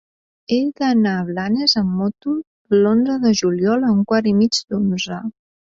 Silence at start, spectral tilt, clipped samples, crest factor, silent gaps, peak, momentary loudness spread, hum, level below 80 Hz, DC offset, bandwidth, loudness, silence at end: 0.5 s; -5.5 dB/octave; under 0.1%; 16 dB; 2.47-2.65 s; -2 dBFS; 9 LU; none; -56 dBFS; under 0.1%; 7.8 kHz; -18 LUFS; 0.45 s